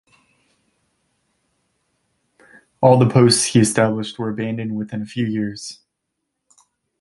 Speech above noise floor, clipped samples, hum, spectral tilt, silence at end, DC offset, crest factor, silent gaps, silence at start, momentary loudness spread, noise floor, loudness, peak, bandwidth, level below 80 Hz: 60 dB; under 0.1%; none; -5 dB/octave; 1.25 s; under 0.1%; 20 dB; none; 2.8 s; 14 LU; -77 dBFS; -18 LUFS; 0 dBFS; 11.5 kHz; -56 dBFS